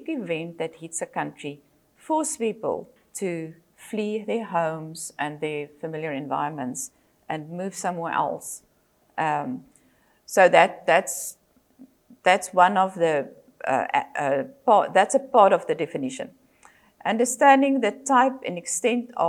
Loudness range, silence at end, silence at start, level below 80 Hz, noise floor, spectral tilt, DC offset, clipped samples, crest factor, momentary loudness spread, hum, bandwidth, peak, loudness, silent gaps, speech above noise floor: 9 LU; 0 s; 0 s; -74 dBFS; -62 dBFS; -4 dB/octave; under 0.1%; under 0.1%; 24 dB; 16 LU; none; 15.5 kHz; -2 dBFS; -24 LUFS; none; 39 dB